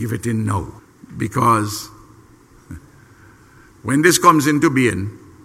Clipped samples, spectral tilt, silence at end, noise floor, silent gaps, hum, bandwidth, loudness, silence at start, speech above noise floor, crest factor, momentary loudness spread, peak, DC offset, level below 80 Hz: under 0.1%; -4.5 dB/octave; 0.3 s; -48 dBFS; none; none; 16 kHz; -17 LUFS; 0 s; 31 dB; 20 dB; 22 LU; 0 dBFS; under 0.1%; -48 dBFS